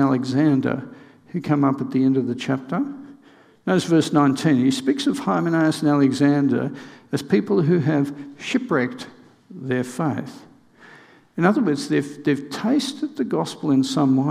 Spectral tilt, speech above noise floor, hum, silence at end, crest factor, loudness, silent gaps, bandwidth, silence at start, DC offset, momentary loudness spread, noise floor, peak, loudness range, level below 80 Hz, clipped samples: -6.5 dB/octave; 31 dB; none; 0 s; 20 dB; -21 LUFS; none; 13.5 kHz; 0 s; under 0.1%; 12 LU; -52 dBFS; -2 dBFS; 6 LU; -68 dBFS; under 0.1%